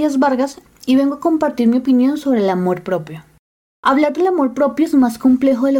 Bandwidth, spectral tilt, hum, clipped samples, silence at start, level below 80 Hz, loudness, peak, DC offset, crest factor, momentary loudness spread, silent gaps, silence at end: 16.5 kHz; -6.5 dB/octave; none; under 0.1%; 0 s; -56 dBFS; -16 LUFS; -2 dBFS; under 0.1%; 12 dB; 7 LU; 3.39-3.83 s; 0 s